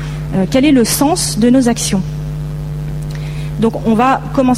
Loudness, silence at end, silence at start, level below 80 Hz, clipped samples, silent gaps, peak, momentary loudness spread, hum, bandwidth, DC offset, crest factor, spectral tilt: -14 LUFS; 0 s; 0 s; -30 dBFS; under 0.1%; none; -2 dBFS; 12 LU; none; 15.5 kHz; under 0.1%; 12 dB; -5 dB/octave